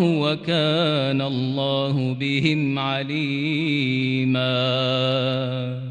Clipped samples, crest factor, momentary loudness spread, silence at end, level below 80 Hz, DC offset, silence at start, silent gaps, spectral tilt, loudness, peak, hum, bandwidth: under 0.1%; 16 dB; 4 LU; 0 s; -62 dBFS; under 0.1%; 0 s; none; -7 dB/octave; -22 LUFS; -6 dBFS; none; 9.4 kHz